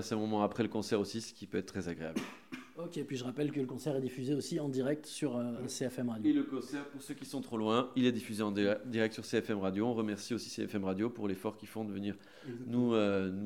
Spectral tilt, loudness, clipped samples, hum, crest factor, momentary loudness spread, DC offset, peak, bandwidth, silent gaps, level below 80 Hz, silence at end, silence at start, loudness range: -5.5 dB/octave; -36 LUFS; under 0.1%; none; 20 dB; 11 LU; under 0.1%; -16 dBFS; 16.5 kHz; none; -74 dBFS; 0 s; 0 s; 4 LU